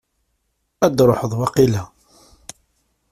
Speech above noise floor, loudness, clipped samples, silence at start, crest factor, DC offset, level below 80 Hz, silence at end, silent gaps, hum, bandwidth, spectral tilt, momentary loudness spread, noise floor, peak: 54 dB; -17 LUFS; under 0.1%; 0.8 s; 18 dB; under 0.1%; -48 dBFS; 1.25 s; none; none; 16 kHz; -6.5 dB/octave; 24 LU; -70 dBFS; -2 dBFS